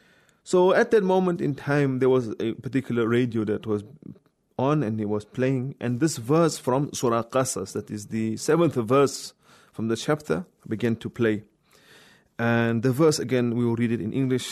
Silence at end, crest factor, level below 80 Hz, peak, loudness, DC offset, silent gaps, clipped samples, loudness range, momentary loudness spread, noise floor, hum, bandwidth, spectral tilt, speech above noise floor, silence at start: 0 s; 16 dB; -64 dBFS; -10 dBFS; -24 LUFS; under 0.1%; none; under 0.1%; 4 LU; 10 LU; -55 dBFS; none; 13.5 kHz; -6 dB/octave; 31 dB; 0.45 s